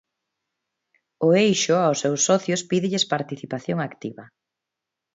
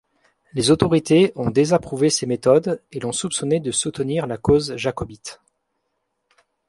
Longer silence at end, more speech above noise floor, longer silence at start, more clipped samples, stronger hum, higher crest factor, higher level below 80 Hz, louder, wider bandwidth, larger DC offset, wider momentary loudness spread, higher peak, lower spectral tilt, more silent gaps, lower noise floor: second, 0.9 s vs 1.35 s; first, 63 dB vs 55 dB; first, 1.2 s vs 0.55 s; neither; neither; about the same, 18 dB vs 20 dB; second, -68 dBFS vs -48 dBFS; about the same, -22 LUFS vs -20 LUFS; second, 8 kHz vs 11.5 kHz; neither; first, 13 LU vs 10 LU; second, -6 dBFS vs 0 dBFS; about the same, -4 dB/octave vs -5 dB/octave; neither; first, -85 dBFS vs -74 dBFS